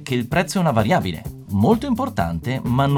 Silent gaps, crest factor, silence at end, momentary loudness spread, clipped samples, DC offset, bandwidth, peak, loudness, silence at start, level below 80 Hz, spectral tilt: none; 16 dB; 0 s; 8 LU; under 0.1%; under 0.1%; 19 kHz; -4 dBFS; -20 LUFS; 0 s; -40 dBFS; -6.5 dB/octave